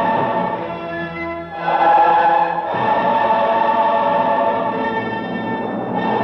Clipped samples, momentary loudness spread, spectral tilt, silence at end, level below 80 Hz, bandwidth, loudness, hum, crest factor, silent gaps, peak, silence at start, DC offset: under 0.1%; 12 LU; -7.5 dB/octave; 0 s; -54 dBFS; 6 kHz; -17 LUFS; none; 12 dB; none; -4 dBFS; 0 s; under 0.1%